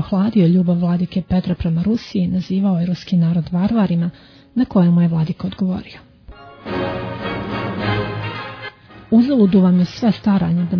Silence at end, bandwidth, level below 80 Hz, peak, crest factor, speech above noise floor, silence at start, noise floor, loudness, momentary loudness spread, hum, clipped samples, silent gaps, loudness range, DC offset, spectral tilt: 0 s; 5.4 kHz; -44 dBFS; -4 dBFS; 14 dB; 24 dB; 0 s; -40 dBFS; -18 LUFS; 12 LU; none; under 0.1%; none; 6 LU; under 0.1%; -9 dB/octave